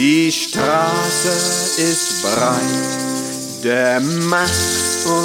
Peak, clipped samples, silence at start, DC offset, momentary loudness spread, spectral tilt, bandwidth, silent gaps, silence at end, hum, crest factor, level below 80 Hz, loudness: -2 dBFS; under 0.1%; 0 s; under 0.1%; 5 LU; -3 dB/octave; 18 kHz; none; 0 s; none; 14 dB; -48 dBFS; -16 LUFS